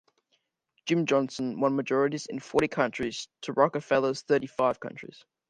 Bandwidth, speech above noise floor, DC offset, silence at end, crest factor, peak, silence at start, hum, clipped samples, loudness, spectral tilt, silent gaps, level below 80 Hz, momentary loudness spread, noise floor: 11.5 kHz; 47 dB; under 0.1%; 0.45 s; 20 dB; -8 dBFS; 0.85 s; none; under 0.1%; -28 LUFS; -5.5 dB/octave; none; -64 dBFS; 12 LU; -75 dBFS